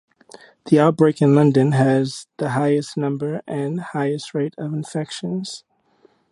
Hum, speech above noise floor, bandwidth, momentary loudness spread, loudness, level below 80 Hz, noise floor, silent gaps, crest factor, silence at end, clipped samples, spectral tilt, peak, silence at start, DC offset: none; 39 dB; 11.5 kHz; 13 LU; -20 LUFS; -66 dBFS; -58 dBFS; none; 18 dB; 0.75 s; under 0.1%; -7 dB/octave; -2 dBFS; 0.65 s; under 0.1%